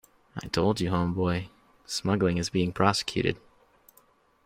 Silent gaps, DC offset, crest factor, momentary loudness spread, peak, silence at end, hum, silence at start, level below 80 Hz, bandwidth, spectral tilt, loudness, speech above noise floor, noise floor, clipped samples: none; under 0.1%; 22 dB; 15 LU; -6 dBFS; 1.1 s; none; 0.35 s; -54 dBFS; 16 kHz; -5.5 dB/octave; -27 LUFS; 36 dB; -63 dBFS; under 0.1%